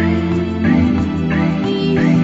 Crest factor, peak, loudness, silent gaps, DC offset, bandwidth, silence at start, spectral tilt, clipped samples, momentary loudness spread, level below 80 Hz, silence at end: 12 dB; -2 dBFS; -16 LUFS; none; under 0.1%; 7.8 kHz; 0 s; -8 dB/octave; under 0.1%; 3 LU; -34 dBFS; 0 s